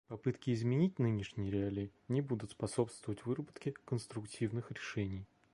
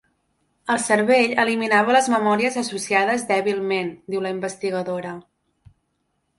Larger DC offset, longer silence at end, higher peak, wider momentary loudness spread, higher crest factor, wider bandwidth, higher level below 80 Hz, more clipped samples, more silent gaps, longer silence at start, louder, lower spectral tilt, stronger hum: neither; second, 0.3 s vs 1.15 s; second, -18 dBFS vs -2 dBFS; about the same, 10 LU vs 11 LU; about the same, 20 dB vs 20 dB; about the same, 11.5 kHz vs 11.5 kHz; about the same, -62 dBFS vs -66 dBFS; neither; neither; second, 0.1 s vs 0.65 s; second, -39 LUFS vs -20 LUFS; first, -7 dB/octave vs -3.5 dB/octave; neither